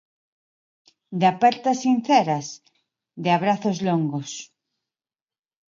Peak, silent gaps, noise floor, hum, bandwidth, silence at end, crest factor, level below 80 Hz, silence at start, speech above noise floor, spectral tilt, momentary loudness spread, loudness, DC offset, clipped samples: -4 dBFS; none; under -90 dBFS; none; 7.6 kHz; 1.25 s; 20 dB; -72 dBFS; 1.1 s; over 69 dB; -5.5 dB/octave; 16 LU; -22 LUFS; under 0.1%; under 0.1%